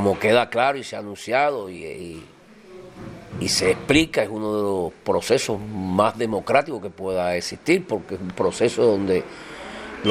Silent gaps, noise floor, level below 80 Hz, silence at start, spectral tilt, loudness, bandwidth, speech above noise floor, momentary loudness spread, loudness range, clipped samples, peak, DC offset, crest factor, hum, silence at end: none; -44 dBFS; -50 dBFS; 0 s; -4.5 dB/octave; -22 LUFS; 15 kHz; 22 dB; 17 LU; 3 LU; under 0.1%; -2 dBFS; under 0.1%; 20 dB; none; 0 s